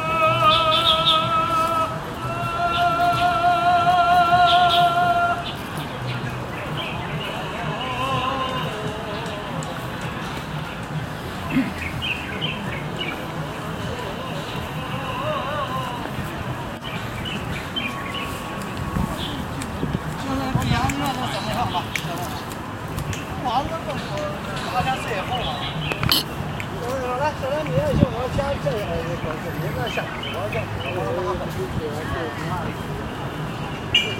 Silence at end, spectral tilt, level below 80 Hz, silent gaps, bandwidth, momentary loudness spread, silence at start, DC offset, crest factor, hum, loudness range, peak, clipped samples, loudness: 0 s; -5 dB/octave; -42 dBFS; none; 16.5 kHz; 12 LU; 0 s; under 0.1%; 24 dB; none; 9 LU; 0 dBFS; under 0.1%; -23 LUFS